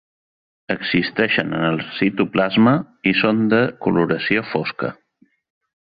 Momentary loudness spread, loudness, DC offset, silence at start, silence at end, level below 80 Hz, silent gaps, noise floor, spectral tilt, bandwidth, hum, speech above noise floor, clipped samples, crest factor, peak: 9 LU; -19 LUFS; under 0.1%; 0.7 s; 1 s; -56 dBFS; none; -60 dBFS; -9 dB/octave; 5 kHz; none; 41 dB; under 0.1%; 18 dB; -2 dBFS